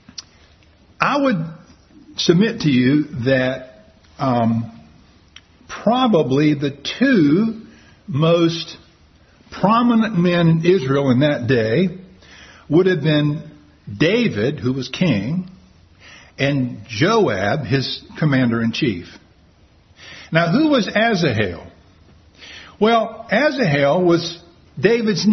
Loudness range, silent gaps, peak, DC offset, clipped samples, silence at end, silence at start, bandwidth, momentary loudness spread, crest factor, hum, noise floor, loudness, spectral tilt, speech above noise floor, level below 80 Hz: 4 LU; none; 0 dBFS; under 0.1%; under 0.1%; 0 s; 1 s; 6.4 kHz; 16 LU; 18 dB; none; -52 dBFS; -18 LUFS; -6.5 dB/octave; 35 dB; -52 dBFS